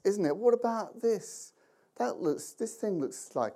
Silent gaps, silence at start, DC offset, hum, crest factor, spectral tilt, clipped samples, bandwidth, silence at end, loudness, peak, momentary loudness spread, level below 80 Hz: none; 0.05 s; under 0.1%; none; 18 dB; -5.5 dB/octave; under 0.1%; 15 kHz; 0 s; -32 LUFS; -14 dBFS; 12 LU; -90 dBFS